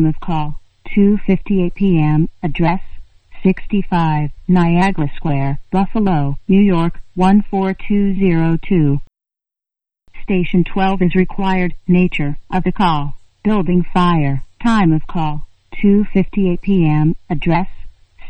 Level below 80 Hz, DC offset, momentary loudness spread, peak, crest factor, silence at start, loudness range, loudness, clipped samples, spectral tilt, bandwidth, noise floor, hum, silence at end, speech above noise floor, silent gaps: -28 dBFS; under 0.1%; 8 LU; 0 dBFS; 14 dB; 0 s; 2 LU; -16 LUFS; under 0.1%; -9 dB/octave; 8.6 kHz; -87 dBFS; none; 0 s; 73 dB; none